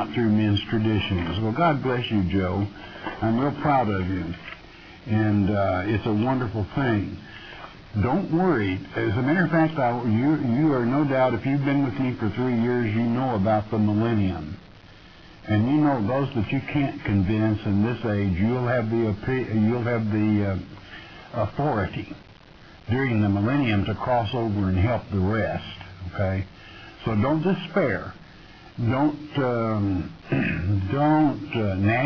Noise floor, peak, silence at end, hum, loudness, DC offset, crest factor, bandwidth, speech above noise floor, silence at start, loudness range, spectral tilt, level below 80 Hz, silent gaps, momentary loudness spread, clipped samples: -47 dBFS; -10 dBFS; 0 s; none; -24 LUFS; under 0.1%; 14 dB; 5.4 kHz; 24 dB; 0 s; 4 LU; -9 dB/octave; -48 dBFS; none; 13 LU; under 0.1%